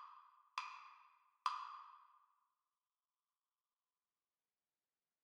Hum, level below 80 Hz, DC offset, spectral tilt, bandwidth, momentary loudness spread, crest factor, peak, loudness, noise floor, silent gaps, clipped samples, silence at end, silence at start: none; under -90 dBFS; under 0.1%; 3.5 dB/octave; 9 kHz; 20 LU; 30 dB; -24 dBFS; -49 LUFS; under -90 dBFS; none; under 0.1%; 3.05 s; 0 s